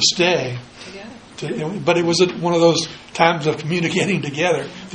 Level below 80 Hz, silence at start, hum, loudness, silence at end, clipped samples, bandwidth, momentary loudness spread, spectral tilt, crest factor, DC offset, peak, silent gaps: -56 dBFS; 0 s; none; -18 LUFS; 0 s; under 0.1%; 10 kHz; 18 LU; -4 dB/octave; 20 dB; under 0.1%; 0 dBFS; none